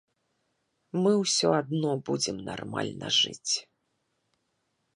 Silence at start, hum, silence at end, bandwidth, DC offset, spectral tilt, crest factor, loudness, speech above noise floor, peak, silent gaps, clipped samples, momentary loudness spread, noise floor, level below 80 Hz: 0.95 s; none; 1.35 s; 10.5 kHz; under 0.1%; -3.5 dB/octave; 20 dB; -27 LUFS; 49 dB; -10 dBFS; none; under 0.1%; 10 LU; -77 dBFS; -68 dBFS